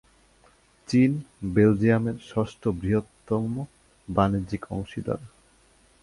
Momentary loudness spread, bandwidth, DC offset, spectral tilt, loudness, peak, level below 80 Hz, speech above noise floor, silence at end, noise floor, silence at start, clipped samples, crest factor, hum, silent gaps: 11 LU; 11.5 kHz; under 0.1%; -8 dB/octave; -26 LUFS; -6 dBFS; -48 dBFS; 35 dB; 0.75 s; -60 dBFS; 0.9 s; under 0.1%; 20 dB; none; none